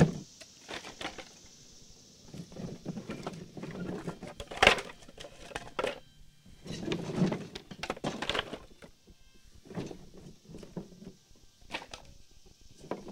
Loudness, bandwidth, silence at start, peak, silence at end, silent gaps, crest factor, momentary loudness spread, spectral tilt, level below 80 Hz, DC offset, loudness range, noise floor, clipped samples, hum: -35 LUFS; 16.5 kHz; 0 s; -4 dBFS; 0 s; none; 34 dB; 21 LU; -4.5 dB/octave; -56 dBFS; under 0.1%; 14 LU; -58 dBFS; under 0.1%; none